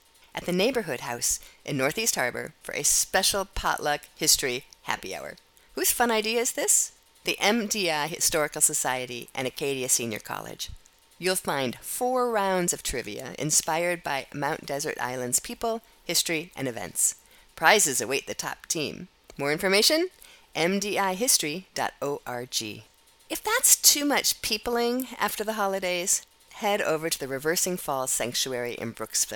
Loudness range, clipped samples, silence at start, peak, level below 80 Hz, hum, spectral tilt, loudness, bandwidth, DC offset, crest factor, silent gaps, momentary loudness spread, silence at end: 4 LU; under 0.1%; 0.35 s; -2 dBFS; -54 dBFS; none; -1.5 dB/octave; -25 LUFS; 19 kHz; under 0.1%; 26 dB; none; 13 LU; 0 s